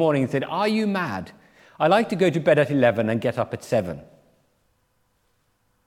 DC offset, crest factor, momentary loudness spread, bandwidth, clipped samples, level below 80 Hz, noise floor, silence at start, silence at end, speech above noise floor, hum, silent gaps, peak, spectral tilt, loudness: under 0.1%; 18 dB; 12 LU; 15.5 kHz; under 0.1%; -64 dBFS; -68 dBFS; 0 s; 1.8 s; 46 dB; none; none; -4 dBFS; -6.5 dB/octave; -22 LUFS